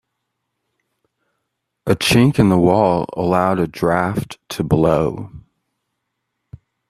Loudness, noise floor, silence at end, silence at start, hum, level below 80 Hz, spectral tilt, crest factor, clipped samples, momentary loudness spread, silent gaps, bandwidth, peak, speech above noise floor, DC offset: -16 LUFS; -75 dBFS; 1.5 s; 1.85 s; none; -44 dBFS; -6 dB/octave; 18 dB; under 0.1%; 14 LU; none; 14.5 kHz; 0 dBFS; 60 dB; under 0.1%